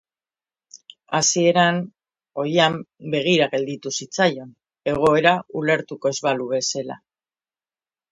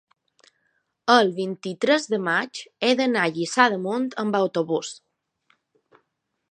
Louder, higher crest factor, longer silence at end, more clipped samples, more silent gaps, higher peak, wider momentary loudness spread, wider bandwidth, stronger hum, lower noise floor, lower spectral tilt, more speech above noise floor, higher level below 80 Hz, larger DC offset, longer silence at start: about the same, -20 LUFS vs -22 LUFS; about the same, 22 dB vs 22 dB; second, 1.15 s vs 1.6 s; neither; neither; about the same, 0 dBFS vs -2 dBFS; about the same, 13 LU vs 11 LU; about the same, 11 kHz vs 10.5 kHz; neither; first, under -90 dBFS vs -75 dBFS; about the same, -3.5 dB/octave vs -4 dB/octave; first, over 70 dB vs 53 dB; first, -60 dBFS vs -78 dBFS; neither; second, 0.75 s vs 1.05 s